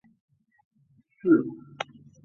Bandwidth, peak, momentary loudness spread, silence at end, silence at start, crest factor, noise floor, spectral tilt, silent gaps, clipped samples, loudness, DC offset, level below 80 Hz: 6.8 kHz; -10 dBFS; 15 LU; 0.4 s; 1.25 s; 20 dB; -64 dBFS; -7 dB/octave; none; under 0.1%; -27 LUFS; under 0.1%; -72 dBFS